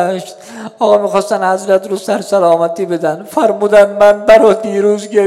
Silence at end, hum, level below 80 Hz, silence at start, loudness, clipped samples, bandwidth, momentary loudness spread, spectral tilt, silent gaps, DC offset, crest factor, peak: 0 s; none; -50 dBFS; 0 s; -11 LUFS; 2%; 14 kHz; 10 LU; -5 dB/octave; none; under 0.1%; 12 dB; 0 dBFS